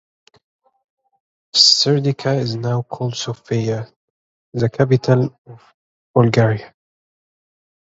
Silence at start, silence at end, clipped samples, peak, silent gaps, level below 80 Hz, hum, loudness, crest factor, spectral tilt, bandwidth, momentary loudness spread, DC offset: 1.55 s; 1.25 s; under 0.1%; 0 dBFS; 3.96-4.52 s, 5.38-5.45 s, 5.74-6.14 s; -56 dBFS; none; -17 LUFS; 20 dB; -5 dB/octave; 8 kHz; 15 LU; under 0.1%